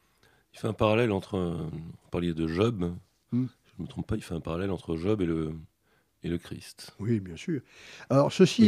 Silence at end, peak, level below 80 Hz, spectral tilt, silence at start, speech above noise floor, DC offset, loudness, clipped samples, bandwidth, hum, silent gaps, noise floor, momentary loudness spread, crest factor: 0 s; -6 dBFS; -52 dBFS; -6.5 dB/octave; 0.55 s; 42 dB; under 0.1%; -30 LUFS; under 0.1%; 14 kHz; none; none; -70 dBFS; 17 LU; 22 dB